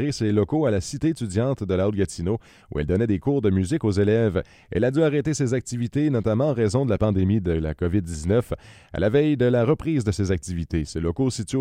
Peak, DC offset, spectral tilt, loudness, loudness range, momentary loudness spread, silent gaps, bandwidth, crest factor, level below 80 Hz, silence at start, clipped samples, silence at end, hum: -8 dBFS; under 0.1%; -7 dB/octave; -23 LUFS; 1 LU; 7 LU; none; 13 kHz; 16 dB; -42 dBFS; 0 s; under 0.1%; 0 s; none